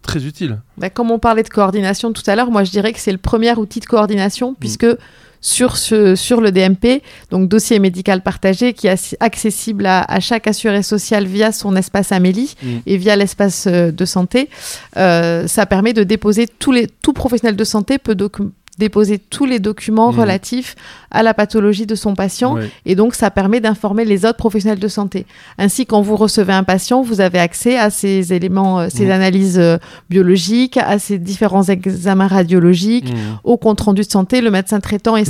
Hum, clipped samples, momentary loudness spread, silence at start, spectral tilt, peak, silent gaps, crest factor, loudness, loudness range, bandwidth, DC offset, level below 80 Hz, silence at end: none; under 0.1%; 8 LU; 0.05 s; -5 dB/octave; 0 dBFS; none; 14 dB; -14 LUFS; 2 LU; 15.5 kHz; under 0.1%; -40 dBFS; 0 s